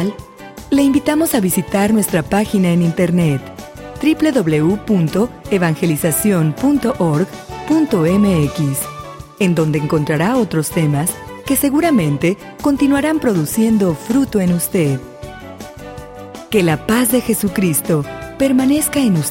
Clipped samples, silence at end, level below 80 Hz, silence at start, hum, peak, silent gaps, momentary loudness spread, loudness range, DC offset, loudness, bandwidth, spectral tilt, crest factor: under 0.1%; 0 s; -42 dBFS; 0 s; none; -2 dBFS; none; 18 LU; 3 LU; under 0.1%; -15 LUFS; 17 kHz; -5.5 dB/octave; 14 dB